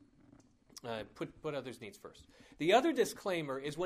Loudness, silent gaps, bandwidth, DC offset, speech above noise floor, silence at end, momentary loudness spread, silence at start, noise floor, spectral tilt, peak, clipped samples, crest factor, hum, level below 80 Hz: -35 LUFS; none; 15.5 kHz; under 0.1%; 28 dB; 0 s; 22 LU; 0.75 s; -64 dBFS; -4.5 dB/octave; -16 dBFS; under 0.1%; 22 dB; none; -70 dBFS